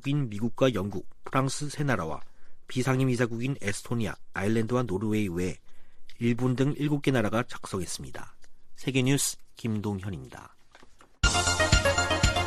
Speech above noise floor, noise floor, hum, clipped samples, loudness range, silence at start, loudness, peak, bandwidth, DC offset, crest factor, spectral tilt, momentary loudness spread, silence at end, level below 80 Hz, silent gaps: 23 dB; -51 dBFS; none; under 0.1%; 3 LU; 0 s; -28 LUFS; -8 dBFS; 15 kHz; under 0.1%; 22 dB; -4.5 dB/octave; 13 LU; 0 s; -40 dBFS; none